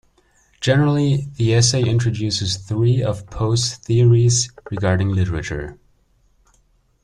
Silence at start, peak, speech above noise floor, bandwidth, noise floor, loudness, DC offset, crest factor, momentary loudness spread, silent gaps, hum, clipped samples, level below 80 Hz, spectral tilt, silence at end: 0.6 s; -2 dBFS; 42 dB; 11 kHz; -59 dBFS; -18 LUFS; under 0.1%; 16 dB; 10 LU; none; none; under 0.1%; -42 dBFS; -5 dB/octave; 1.3 s